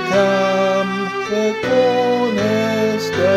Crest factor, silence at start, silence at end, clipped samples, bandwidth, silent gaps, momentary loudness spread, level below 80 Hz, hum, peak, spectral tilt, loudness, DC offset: 14 dB; 0 s; 0 s; under 0.1%; 15.5 kHz; none; 4 LU; -54 dBFS; none; -4 dBFS; -5 dB/octave; -17 LUFS; under 0.1%